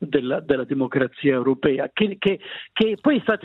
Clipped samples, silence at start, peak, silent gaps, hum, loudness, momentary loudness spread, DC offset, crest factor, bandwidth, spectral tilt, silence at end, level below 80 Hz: under 0.1%; 0 s; -4 dBFS; none; none; -22 LUFS; 4 LU; under 0.1%; 18 dB; 5.4 kHz; -8.5 dB/octave; 0.1 s; -56 dBFS